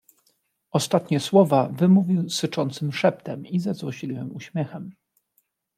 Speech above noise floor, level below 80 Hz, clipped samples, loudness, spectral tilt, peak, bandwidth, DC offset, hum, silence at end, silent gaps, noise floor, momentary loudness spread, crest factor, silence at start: 48 dB; -70 dBFS; under 0.1%; -23 LUFS; -6 dB/octave; -4 dBFS; 14.5 kHz; under 0.1%; none; 0.85 s; none; -70 dBFS; 14 LU; 20 dB; 0.75 s